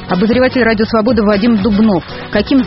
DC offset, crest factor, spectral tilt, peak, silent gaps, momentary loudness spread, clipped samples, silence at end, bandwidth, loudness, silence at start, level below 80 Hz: under 0.1%; 12 dB; -5 dB/octave; 0 dBFS; none; 5 LU; under 0.1%; 0 s; 5.8 kHz; -12 LUFS; 0 s; -32 dBFS